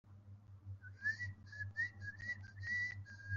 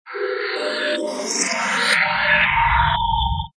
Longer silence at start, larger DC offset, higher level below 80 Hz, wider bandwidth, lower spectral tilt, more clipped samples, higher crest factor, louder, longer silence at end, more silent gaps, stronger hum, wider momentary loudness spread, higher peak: about the same, 0.05 s vs 0.05 s; neither; second, -72 dBFS vs -32 dBFS; second, 7.2 kHz vs 11 kHz; about the same, -3 dB/octave vs -2.5 dB/octave; neither; about the same, 16 dB vs 16 dB; second, -43 LUFS vs -18 LUFS; about the same, 0 s vs 0.1 s; neither; neither; first, 18 LU vs 8 LU; second, -30 dBFS vs -4 dBFS